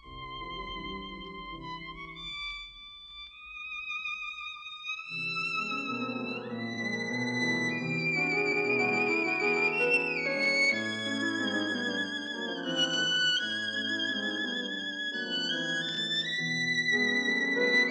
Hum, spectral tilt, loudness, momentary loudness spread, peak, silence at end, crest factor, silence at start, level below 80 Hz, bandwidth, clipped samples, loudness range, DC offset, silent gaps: none; -3 dB/octave; -29 LUFS; 15 LU; -14 dBFS; 0 s; 16 dB; 0.05 s; -60 dBFS; 9.4 kHz; under 0.1%; 11 LU; under 0.1%; none